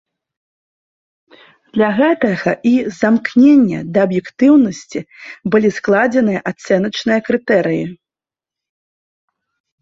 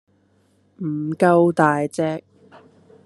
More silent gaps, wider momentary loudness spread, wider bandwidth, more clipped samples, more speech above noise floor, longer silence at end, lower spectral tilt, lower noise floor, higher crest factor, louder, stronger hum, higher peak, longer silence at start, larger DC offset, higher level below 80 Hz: neither; about the same, 12 LU vs 14 LU; second, 7.8 kHz vs 12 kHz; neither; first, 76 dB vs 42 dB; first, 1.85 s vs 0.85 s; about the same, -6.5 dB/octave vs -7.5 dB/octave; first, -90 dBFS vs -60 dBFS; second, 14 dB vs 20 dB; first, -14 LUFS vs -19 LUFS; second, none vs 50 Hz at -55 dBFS; about the same, 0 dBFS vs 0 dBFS; first, 1.75 s vs 0.8 s; neither; first, -56 dBFS vs -68 dBFS